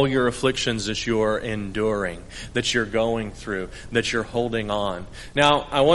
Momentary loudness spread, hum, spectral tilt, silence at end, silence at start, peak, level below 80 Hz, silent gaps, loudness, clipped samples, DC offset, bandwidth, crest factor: 10 LU; none; -4.5 dB/octave; 0 s; 0 s; -2 dBFS; -42 dBFS; none; -24 LUFS; under 0.1%; under 0.1%; 11.5 kHz; 20 dB